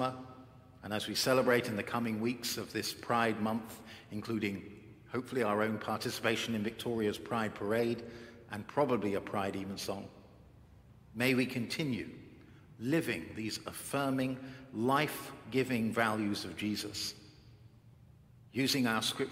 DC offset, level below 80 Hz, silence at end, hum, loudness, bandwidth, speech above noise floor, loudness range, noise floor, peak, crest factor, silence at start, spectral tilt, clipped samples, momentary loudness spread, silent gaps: under 0.1%; -68 dBFS; 0 s; none; -34 LUFS; 16 kHz; 25 dB; 3 LU; -59 dBFS; -14 dBFS; 22 dB; 0 s; -4.5 dB/octave; under 0.1%; 15 LU; none